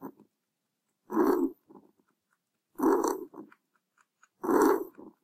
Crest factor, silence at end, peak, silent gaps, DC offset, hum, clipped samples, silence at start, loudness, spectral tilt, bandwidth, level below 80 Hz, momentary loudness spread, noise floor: 22 dB; 0.15 s; -10 dBFS; none; under 0.1%; none; under 0.1%; 0 s; -28 LUFS; -5 dB/octave; 16 kHz; -70 dBFS; 17 LU; -83 dBFS